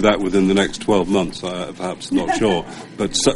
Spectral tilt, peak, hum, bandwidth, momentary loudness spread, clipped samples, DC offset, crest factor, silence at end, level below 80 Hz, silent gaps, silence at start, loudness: -4.5 dB/octave; -2 dBFS; none; 11.5 kHz; 10 LU; under 0.1%; under 0.1%; 16 dB; 0 s; -40 dBFS; none; 0 s; -19 LUFS